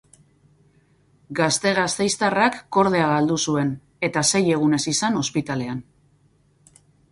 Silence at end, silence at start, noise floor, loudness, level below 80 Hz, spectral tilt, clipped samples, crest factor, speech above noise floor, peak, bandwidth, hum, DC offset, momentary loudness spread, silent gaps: 1.3 s; 1.3 s; -60 dBFS; -21 LUFS; -60 dBFS; -4 dB/octave; under 0.1%; 18 dB; 39 dB; -4 dBFS; 11.5 kHz; none; under 0.1%; 9 LU; none